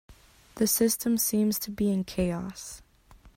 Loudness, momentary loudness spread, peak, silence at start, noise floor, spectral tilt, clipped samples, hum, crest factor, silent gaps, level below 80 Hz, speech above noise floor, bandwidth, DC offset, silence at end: -27 LUFS; 16 LU; -12 dBFS; 0.1 s; -55 dBFS; -4.5 dB/octave; under 0.1%; none; 16 dB; none; -52 dBFS; 28 dB; 16.5 kHz; under 0.1%; 0.1 s